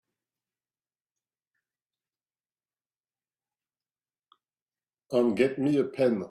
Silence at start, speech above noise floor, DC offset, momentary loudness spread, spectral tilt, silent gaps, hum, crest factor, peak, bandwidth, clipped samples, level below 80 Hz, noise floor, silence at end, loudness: 5.1 s; over 65 dB; under 0.1%; 2 LU; -7.5 dB/octave; none; none; 22 dB; -10 dBFS; 12 kHz; under 0.1%; -74 dBFS; under -90 dBFS; 0 s; -26 LUFS